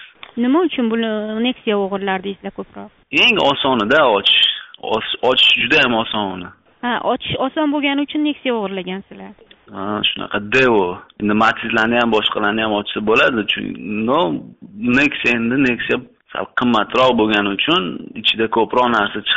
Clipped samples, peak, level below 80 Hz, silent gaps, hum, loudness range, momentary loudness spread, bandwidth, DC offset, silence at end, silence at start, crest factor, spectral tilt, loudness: under 0.1%; -4 dBFS; -50 dBFS; none; none; 6 LU; 14 LU; 8 kHz; under 0.1%; 0 s; 0 s; 14 dB; -1.5 dB/octave; -16 LUFS